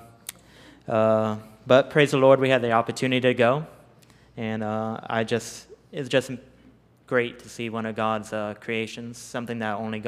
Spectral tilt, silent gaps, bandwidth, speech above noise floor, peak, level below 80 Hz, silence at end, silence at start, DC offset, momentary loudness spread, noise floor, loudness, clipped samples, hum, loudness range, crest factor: -5.5 dB/octave; none; 15 kHz; 32 dB; -4 dBFS; -64 dBFS; 0 s; 0 s; under 0.1%; 19 LU; -55 dBFS; -24 LUFS; under 0.1%; none; 9 LU; 22 dB